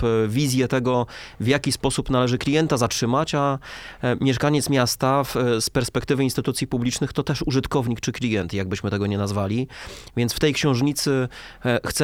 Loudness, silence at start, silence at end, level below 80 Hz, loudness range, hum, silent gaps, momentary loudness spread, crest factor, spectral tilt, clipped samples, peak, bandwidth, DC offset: -22 LUFS; 0 s; 0 s; -44 dBFS; 3 LU; none; none; 6 LU; 18 dB; -5 dB/octave; under 0.1%; -4 dBFS; 17.5 kHz; under 0.1%